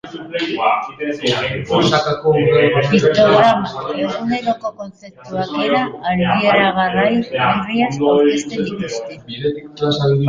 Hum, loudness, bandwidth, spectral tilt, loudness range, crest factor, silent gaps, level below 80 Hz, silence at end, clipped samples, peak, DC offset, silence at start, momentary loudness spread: none; -16 LUFS; 9.4 kHz; -6 dB/octave; 3 LU; 14 dB; none; -48 dBFS; 0 s; under 0.1%; -2 dBFS; under 0.1%; 0.05 s; 11 LU